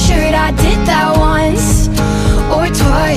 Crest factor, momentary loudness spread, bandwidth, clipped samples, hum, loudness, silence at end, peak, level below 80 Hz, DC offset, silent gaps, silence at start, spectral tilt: 10 dB; 2 LU; 15.5 kHz; under 0.1%; none; -12 LUFS; 0 s; 0 dBFS; -16 dBFS; under 0.1%; none; 0 s; -5 dB/octave